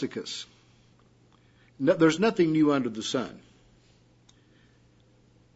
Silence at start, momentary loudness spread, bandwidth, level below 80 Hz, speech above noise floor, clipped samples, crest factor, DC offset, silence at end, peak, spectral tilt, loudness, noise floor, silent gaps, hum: 0 s; 16 LU; 8 kHz; -68 dBFS; 35 dB; under 0.1%; 20 dB; under 0.1%; 2.15 s; -10 dBFS; -5.5 dB/octave; -26 LUFS; -61 dBFS; none; none